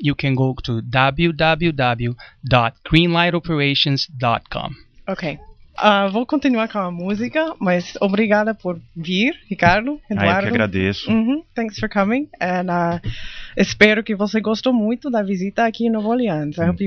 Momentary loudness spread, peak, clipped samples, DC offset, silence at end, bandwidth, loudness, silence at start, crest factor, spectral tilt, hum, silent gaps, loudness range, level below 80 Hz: 11 LU; 0 dBFS; under 0.1%; under 0.1%; 0 s; 7 kHz; -19 LUFS; 0 s; 18 dB; -6.5 dB/octave; none; none; 3 LU; -40 dBFS